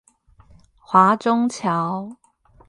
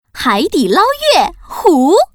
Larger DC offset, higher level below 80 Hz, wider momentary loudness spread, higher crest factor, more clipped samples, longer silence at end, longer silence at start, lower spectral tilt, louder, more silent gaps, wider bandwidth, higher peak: neither; second, -60 dBFS vs -42 dBFS; first, 14 LU vs 5 LU; first, 20 dB vs 12 dB; second, under 0.1% vs 0.2%; first, 0.55 s vs 0.1 s; first, 0.9 s vs 0.15 s; first, -6 dB/octave vs -3.5 dB/octave; second, -19 LUFS vs -12 LUFS; neither; second, 10.5 kHz vs 19.5 kHz; about the same, -2 dBFS vs 0 dBFS